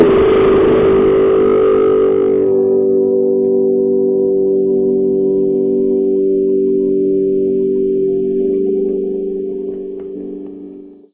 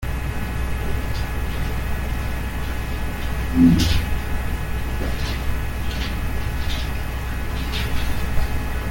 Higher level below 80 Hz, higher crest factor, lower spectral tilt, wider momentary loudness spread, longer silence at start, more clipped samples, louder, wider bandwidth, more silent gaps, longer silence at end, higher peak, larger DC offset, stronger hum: second, -40 dBFS vs -26 dBFS; second, 12 dB vs 18 dB; first, -12 dB/octave vs -5.5 dB/octave; first, 13 LU vs 8 LU; about the same, 0 s vs 0 s; neither; first, -13 LUFS vs -24 LUFS; second, 3.8 kHz vs 17 kHz; neither; first, 0.2 s vs 0 s; first, 0 dBFS vs -4 dBFS; neither; neither